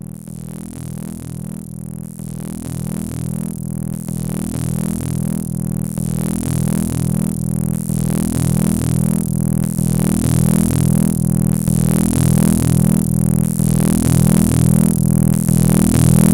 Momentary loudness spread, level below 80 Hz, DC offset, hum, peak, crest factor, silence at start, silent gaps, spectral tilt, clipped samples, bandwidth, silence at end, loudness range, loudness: 15 LU; -32 dBFS; under 0.1%; none; -2 dBFS; 14 dB; 0.05 s; none; -6.5 dB/octave; under 0.1%; 17 kHz; 0 s; 11 LU; -16 LUFS